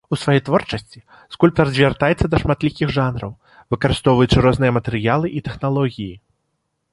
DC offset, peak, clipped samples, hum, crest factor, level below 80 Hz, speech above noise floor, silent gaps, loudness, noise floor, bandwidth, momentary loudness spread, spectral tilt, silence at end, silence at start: under 0.1%; 0 dBFS; under 0.1%; none; 18 dB; -36 dBFS; 54 dB; none; -18 LUFS; -72 dBFS; 11.5 kHz; 13 LU; -7 dB/octave; 0.75 s; 0.1 s